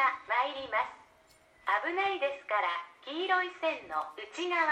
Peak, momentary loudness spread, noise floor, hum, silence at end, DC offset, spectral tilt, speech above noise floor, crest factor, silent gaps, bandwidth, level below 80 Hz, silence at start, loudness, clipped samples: -14 dBFS; 9 LU; -63 dBFS; none; 0 s; under 0.1%; -2.5 dB/octave; 30 dB; 18 dB; none; 10.5 kHz; -74 dBFS; 0 s; -32 LUFS; under 0.1%